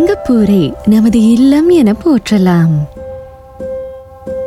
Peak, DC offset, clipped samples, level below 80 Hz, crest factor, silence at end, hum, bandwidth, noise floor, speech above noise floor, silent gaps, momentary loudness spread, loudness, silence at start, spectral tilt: -2 dBFS; under 0.1%; under 0.1%; -36 dBFS; 10 dB; 0 s; none; 14.5 kHz; -30 dBFS; 21 dB; none; 20 LU; -9 LUFS; 0 s; -7.5 dB/octave